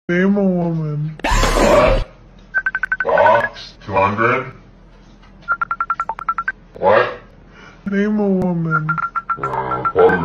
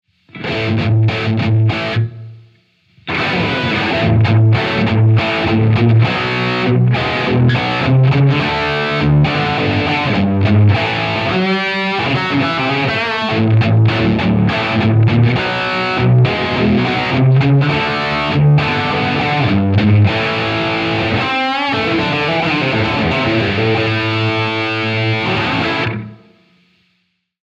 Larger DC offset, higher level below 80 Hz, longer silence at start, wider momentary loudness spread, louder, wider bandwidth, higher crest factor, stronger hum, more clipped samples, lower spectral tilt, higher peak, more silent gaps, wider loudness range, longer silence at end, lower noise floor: neither; first, -30 dBFS vs -42 dBFS; second, 0.1 s vs 0.35 s; first, 10 LU vs 4 LU; second, -17 LUFS vs -14 LUFS; first, 15 kHz vs 7.4 kHz; about the same, 16 dB vs 12 dB; neither; neither; second, -6 dB/octave vs -7.5 dB/octave; about the same, 0 dBFS vs -2 dBFS; neither; about the same, 5 LU vs 3 LU; second, 0 s vs 1.35 s; second, -44 dBFS vs -65 dBFS